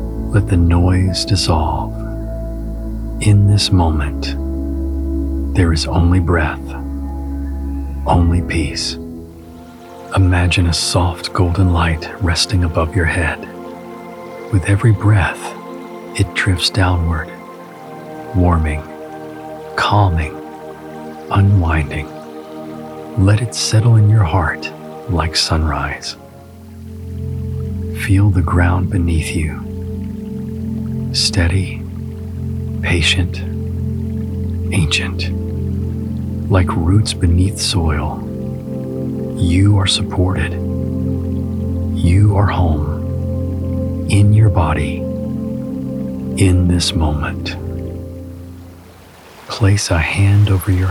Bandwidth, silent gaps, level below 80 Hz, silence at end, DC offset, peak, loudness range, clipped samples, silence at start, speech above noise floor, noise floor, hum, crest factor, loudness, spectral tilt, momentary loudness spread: 12.5 kHz; none; -26 dBFS; 0 s; under 0.1%; -2 dBFS; 4 LU; under 0.1%; 0 s; 26 dB; -40 dBFS; none; 14 dB; -16 LUFS; -5.5 dB/octave; 17 LU